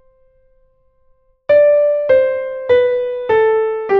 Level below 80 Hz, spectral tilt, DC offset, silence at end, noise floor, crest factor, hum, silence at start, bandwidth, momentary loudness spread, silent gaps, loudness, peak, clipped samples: -54 dBFS; -6.5 dB/octave; under 0.1%; 0 s; -56 dBFS; 14 dB; none; 1.5 s; 4.8 kHz; 8 LU; none; -14 LUFS; -2 dBFS; under 0.1%